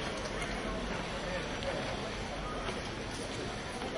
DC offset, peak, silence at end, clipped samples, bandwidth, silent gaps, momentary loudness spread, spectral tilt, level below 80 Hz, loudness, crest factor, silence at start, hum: under 0.1%; -20 dBFS; 0 s; under 0.1%; 11.5 kHz; none; 3 LU; -4 dB/octave; -48 dBFS; -37 LUFS; 16 dB; 0 s; none